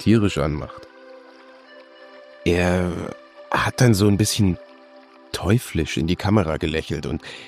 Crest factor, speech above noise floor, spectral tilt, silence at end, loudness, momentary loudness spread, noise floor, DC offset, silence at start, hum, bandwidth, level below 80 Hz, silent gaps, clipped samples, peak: 18 dB; 27 dB; -5.5 dB/octave; 0 s; -21 LUFS; 14 LU; -47 dBFS; under 0.1%; 0 s; none; 15.5 kHz; -40 dBFS; none; under 0.1%; -4 dBFS